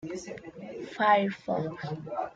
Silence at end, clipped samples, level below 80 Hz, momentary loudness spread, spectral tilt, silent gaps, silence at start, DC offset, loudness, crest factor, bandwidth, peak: 0 s; under 0.1%; -68 dBFS; 19 LU; -6 dB/octave; none; 0 s; under 0.1%; -29 LUFS; 20 dB; 9 kHz; -10 dBFS